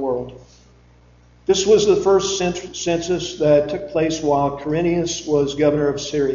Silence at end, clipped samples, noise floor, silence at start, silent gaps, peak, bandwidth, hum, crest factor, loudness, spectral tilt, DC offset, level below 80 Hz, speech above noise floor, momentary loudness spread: 0 s; under 0.1%; -50 dBFS; 0 s; none; -4 dBFS; 7.6 kHz; 60 Hz at -50 dBFS; 16 dB; -19 LUFS; -4.5 dB/octave; under 0.1%; -46 dBFS; 32 dB; 9 LU